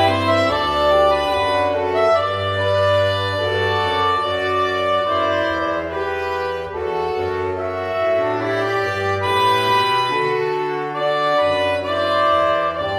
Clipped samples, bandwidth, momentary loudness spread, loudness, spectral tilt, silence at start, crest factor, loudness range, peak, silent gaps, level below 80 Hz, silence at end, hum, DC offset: under 0.1%; 15.5 kHz; 7 LU; -18 LUFS; -5 dB/octave; 0 s; 14 dB; 4 LU; -4 dBFS; none; -46 dBFS; 0 s; none; under 0.1%